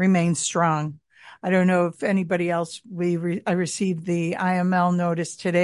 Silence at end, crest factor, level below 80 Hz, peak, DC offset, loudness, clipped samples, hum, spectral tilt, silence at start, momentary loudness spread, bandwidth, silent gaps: 0 s; 16 dB; -66 dBFS; -6 dBFS; under 0.1%; -23 LUFS; under 0.1%; none; -6 dB/octave; 0 s; 7 LU; 11.5 kHz; none